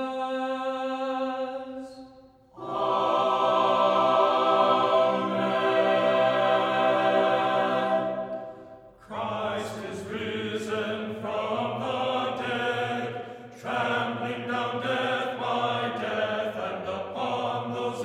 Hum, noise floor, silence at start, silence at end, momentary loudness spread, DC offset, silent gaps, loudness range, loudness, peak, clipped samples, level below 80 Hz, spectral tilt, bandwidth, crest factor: none; -53 dBFS; 0 s; 0 s; 13 LU; under 0.1%; none; 8 LU; -26 LUFS; -10 dBFS; under 0.1%; -70 dBFS; -5.5 dB/octave; 12.5 kHz; 18 dB